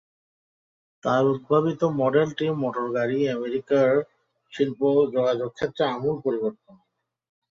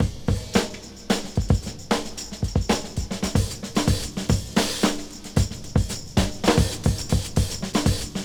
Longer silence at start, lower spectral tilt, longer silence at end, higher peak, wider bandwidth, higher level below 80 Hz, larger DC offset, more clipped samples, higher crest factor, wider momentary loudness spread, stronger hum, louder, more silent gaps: first, 1.05 s vs 0 s; first, -7.5 dB/octave vs -5 dB/octave; first, 1.05 s vs 0 s; about the same, -6 dBFS vs -4 dBFS; second, 7.4 kHz vs over 20 kHz; second, -66 dBFS vs -32 dBFS; neither; neither; about the same, 18 dB vs 20 dB; about the same, 8 LU vs 6 LU; neither; about the same, -24 LUFS vs -25 LUFS; neither